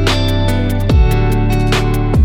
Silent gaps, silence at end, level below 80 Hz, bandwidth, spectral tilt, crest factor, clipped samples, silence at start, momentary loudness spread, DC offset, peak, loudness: none; 0 s; -16 dBFS; 17 kHz; -6.5 dB/octave; 10 dB; under 0.1%; 0 s; 3 LU; under 0.1%; -2 dBFS; -14 LUFS